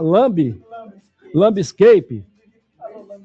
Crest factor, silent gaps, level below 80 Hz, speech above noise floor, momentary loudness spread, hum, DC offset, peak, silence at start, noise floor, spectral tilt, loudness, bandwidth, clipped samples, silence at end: 14 dB; none; -58 dBFS; 44 dB; 25 LU; none; under 0.1%; -2 dBFS; 0 s; -58 dBFS; -7 dB/octave; -15 LUFS; 8 kHz; under 0.1%; 0.1 s